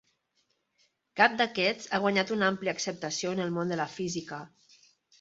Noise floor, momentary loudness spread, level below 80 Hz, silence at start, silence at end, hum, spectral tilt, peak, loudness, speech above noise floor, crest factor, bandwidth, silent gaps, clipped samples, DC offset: -75 dBFS; 11 LU; -72 dBFS; 1.15 s; 0.75 s; none; -4 dB/octave; -6 dBFS; -29 LUFS; 46 dB; 26 dB; 8 kHz; none; under 0.1%; under 0.1%